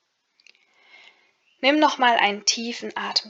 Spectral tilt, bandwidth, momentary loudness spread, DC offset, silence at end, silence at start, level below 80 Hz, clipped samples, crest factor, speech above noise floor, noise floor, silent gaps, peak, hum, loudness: -1 dB/octave; 8 kHz; 10 LU; under 0.1%; 0 s; 1.6 s; -86 dBFS; under 0.1%; 22 dB; 41 dB; -63 dBFS; none; -2 dBFS; none; -21 LUFS